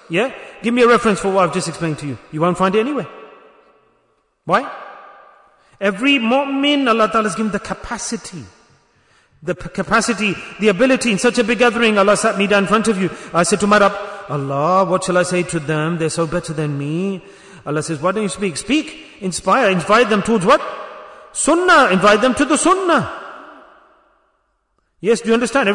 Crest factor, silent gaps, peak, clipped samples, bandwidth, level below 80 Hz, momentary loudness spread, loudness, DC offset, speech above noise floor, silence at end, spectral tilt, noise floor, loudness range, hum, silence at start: 16 dB; none; -2 dBFS; under 0.1%; 11 kHz; -48 dBFS; 15 LU; -16 LUFS; under 0.1%; 50 dB; 0 s; -4.5 dB/octave; -66 dBFS; 7 LU; none; 0.1 s